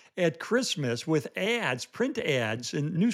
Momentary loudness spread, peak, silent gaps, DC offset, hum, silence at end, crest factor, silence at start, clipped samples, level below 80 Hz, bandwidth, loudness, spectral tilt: 4 LU; -12 dBFS; none; under 0.1%; none; 0 s; 16 dB; 0.15 s; under 0.1%; -76 dBFS; 15 kHz; -29 LUFS; -5 dB/octave